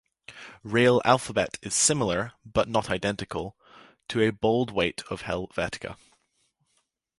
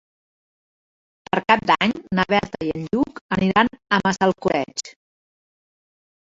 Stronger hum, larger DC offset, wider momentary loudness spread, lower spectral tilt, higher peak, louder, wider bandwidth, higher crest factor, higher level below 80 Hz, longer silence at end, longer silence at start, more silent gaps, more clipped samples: neither; neither; first, 19 LU vs 9 LU; second, -3.5 dB/octave vs -5 dB/octave; about the same, -4 dBFS vs -2 dBFS; second, -26 LUFS vs -21 LUFS; first, 11.5 kHz vs 8 kHz; about the same, 24 dB vs 22 dB; about the same, -52 dBFS vs -52 dBFS; second, 1.25 s vs 1.4 s; second, 0.3 s vs 1.35 s; second, none vs 3.21-3.29 s; neither